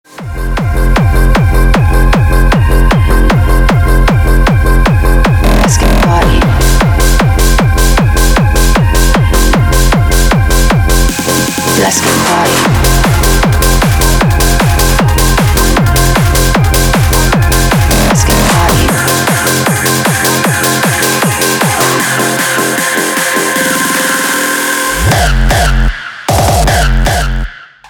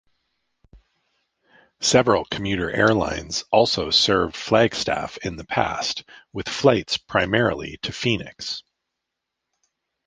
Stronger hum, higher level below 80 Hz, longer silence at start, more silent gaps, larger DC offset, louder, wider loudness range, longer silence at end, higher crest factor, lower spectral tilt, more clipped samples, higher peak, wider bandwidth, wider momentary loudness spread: neither; first, -12 dBFS vs -48 dBFS; second, 0.15 s vs 0.75 s; neither; neither; first, -9 LUFS vs -21 LUFS; second, 1 LU vs 4 LU; second, 0.25 s vs 1.45 s; second, 8 dB vs 22 dB; about the same, -4 dB/octave vs -4 dB/octave; neither; about the same, 0 dBFS vs -2 dBFS; first, over 20 kHz vs 10 kHz; second, 2 LU vs 13 LU